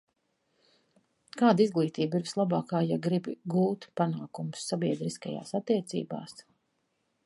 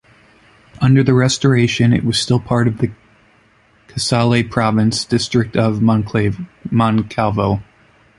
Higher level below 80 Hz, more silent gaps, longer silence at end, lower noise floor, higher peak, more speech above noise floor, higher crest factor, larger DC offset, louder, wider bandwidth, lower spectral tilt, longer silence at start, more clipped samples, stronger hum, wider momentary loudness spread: second, -76 dBFS vs -42 dBFS; neither; first, 0.85 s vs 0.55 s; first, -77 dBFS vs -53 dBFS; second, -10 dBFS vs 0 dBFS; first, 48 dB vs 38 dB; first, 22 dB vs 16 dB; neither; second, -30 LUFS vs -16 LUFS; about the same, 11.5 kHz vs 11.5 kHz; about the same, -6.5 dB/octave vs -6 dB/octave; first, 1.35 s vs 0.8 s; neither; neither; first, 13 LU vs 8 LU